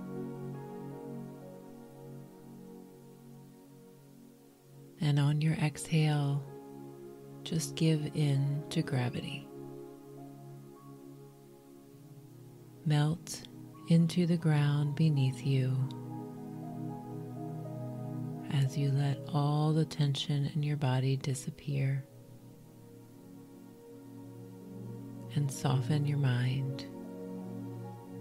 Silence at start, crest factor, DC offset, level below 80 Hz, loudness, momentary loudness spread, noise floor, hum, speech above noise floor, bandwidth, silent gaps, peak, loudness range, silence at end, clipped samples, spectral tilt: 0 s; 18 dB; under 0.1%; -68 dBFS; -33 LUFS; 23 LU; -57 dBFS; none; 27 dB; 14.5 kHz; none; -16 dBFS; 17 LU; 0 s; under 0.1%; -6.5 dB/octave